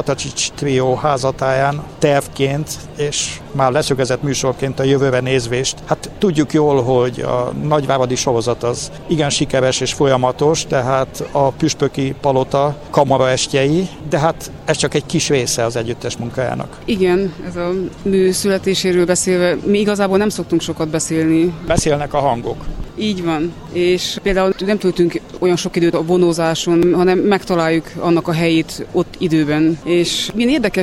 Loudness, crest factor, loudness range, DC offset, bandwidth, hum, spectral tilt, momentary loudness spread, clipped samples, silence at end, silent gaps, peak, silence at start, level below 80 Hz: -16 LUFS; 16 dB; 3 LU; under 0.1%; 15.5 kHz; none; -5 dB/octave; 7 LU; under 0.1%; 0 s; none; 0 dBFS; 0 s; -38 dBFS